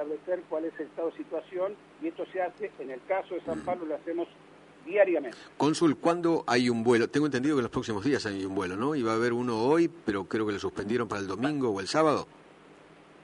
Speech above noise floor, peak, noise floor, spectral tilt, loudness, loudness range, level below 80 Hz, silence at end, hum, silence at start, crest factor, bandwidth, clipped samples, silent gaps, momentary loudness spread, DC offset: 25 dB; -10 dBFS; -54 dBFS; -5.5 dB/octave; -29 LUFS; 8 LU; -64 dBFS; 0.5 s; 50 Hz at -65 dBFS; 0 s; 20 dB; 11 kHz; under 0.1%; none; 11 LU; under 0.1%